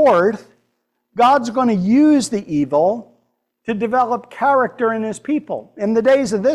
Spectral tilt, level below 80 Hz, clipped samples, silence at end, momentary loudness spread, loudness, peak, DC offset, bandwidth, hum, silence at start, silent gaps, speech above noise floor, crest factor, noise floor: -6 dB/octave; -58 dBFS; under 0.1%; 0 s; 11 LU; -17 LUFS; -4 dBFS; under 0.1%; 12 kHz; none; 0 s; none; 54 dB; 12 dB; -70 dBFS